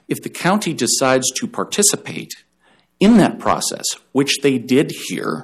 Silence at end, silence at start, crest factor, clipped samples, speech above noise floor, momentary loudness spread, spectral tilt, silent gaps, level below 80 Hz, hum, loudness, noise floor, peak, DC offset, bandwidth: 0 s; 0.1 s; 16 dB; under 0.1%; 40 dB; 12 LU; -3.5 dB/octave; none; -54 dBFS; none; -17 LUFS; -58 dBFS; -2 dBFS; under 0.1%; 15.5 kHz